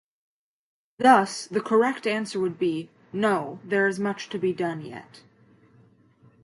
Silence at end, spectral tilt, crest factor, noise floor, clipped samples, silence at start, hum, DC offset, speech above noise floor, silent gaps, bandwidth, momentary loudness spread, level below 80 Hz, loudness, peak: 1.25 s; -5 dB/octave; 22 dB; -58 dBFS; under 0.1%; 1 s; none; under 0.1%; 34 dB; none; 11.5 kHz; 15 LU; -74 dBFS; -24 LUFS; -4 dBFS